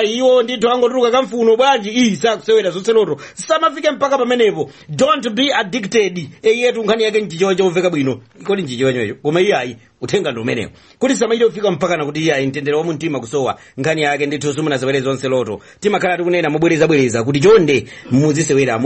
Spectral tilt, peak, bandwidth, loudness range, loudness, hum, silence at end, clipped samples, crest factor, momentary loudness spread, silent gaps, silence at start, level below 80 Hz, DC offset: -5 dB/octave; -2 dBFS; 8.8 kHz; 4 LU; -16 LUFS; none; 0 s; under 0.1%; 14 dB; 8 LU; none; 0 s; -54 dBFS; under 0.1%